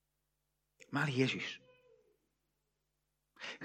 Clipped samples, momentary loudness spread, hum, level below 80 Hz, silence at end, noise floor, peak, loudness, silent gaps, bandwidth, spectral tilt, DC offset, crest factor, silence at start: under 0.1%; 15 LU; none; -84 dBFS; 0 s; -85 dBFS; -18 dBFS; -37 LUFS; none; 14.5 kHz; -5.5 dB/octave; under 0.1%; 24 dB; 0.9 s